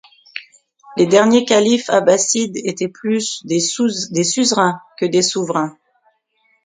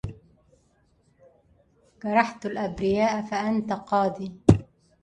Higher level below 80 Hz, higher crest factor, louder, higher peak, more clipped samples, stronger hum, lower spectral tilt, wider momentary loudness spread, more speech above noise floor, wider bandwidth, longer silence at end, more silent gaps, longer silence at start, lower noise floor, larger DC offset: second, -62 dBFS vs -44 dBFS; second, 16 dB vs 26 dB; first, -16 LUFS vs -25 LUFS; about the same, 0 dBFS vs 0 dBFS; neither; neither; second, -3.5 dB/octave vs -7 dB/octave; first, 12 LU vs 9 LU; first, 46 dB vs 39 dB; second, 9.6 kHz vs 11 kHz; first, 0.9 s vs 0.4 s; neither; first, 0.35 s vs 0.05 s; about the same, -62 dBFS vs -65 dBFS; neither